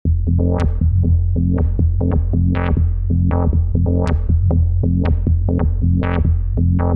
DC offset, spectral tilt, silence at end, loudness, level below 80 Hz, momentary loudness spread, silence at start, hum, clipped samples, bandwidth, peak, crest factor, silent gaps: under 0.1%; -10.5 dB/octave; 0 s; -17 LUFS; -20 dBFS; 2 LU; 0.05 s; none; under 0.1%; 3.7 kHz; -4 dBFS; 10 dB; none